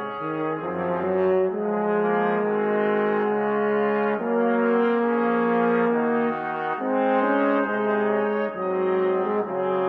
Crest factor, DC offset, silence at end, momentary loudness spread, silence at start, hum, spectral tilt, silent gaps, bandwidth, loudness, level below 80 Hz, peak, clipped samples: 14 dB; under 0.1%; 0 s; 5 LU; 0 s; none; -9.5 dB/octave; none; 4.7 kHz; -23 LUFS; -70 dBFS; -8 dBFS; under 0.1%